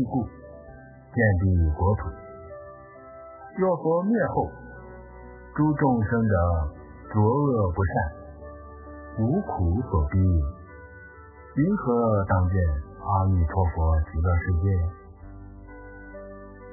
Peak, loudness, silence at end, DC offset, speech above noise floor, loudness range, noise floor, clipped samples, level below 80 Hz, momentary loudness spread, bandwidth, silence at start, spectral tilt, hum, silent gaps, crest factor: -8 dBFS; -25 LUFS; 0 s; under 0.1%; 23 dB; 3 LU; -46 dBFS; under 0.1%; -32 dBFS; 22 LU; 2.1 kHz; 0 s; -15.5 dB/octave; none; none; 16 dB